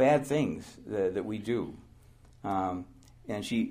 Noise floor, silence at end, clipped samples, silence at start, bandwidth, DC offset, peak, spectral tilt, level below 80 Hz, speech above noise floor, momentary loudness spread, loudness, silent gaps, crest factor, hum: -57 dBFS; 0 s; under 0.1%; 0 s; 15.5 kHz; under 0.1%; -14 dBFS; -6.5 dB/octave; -60 dBFS; 26 dB; 13 LU; -32 LUFS; none; 18 dB; none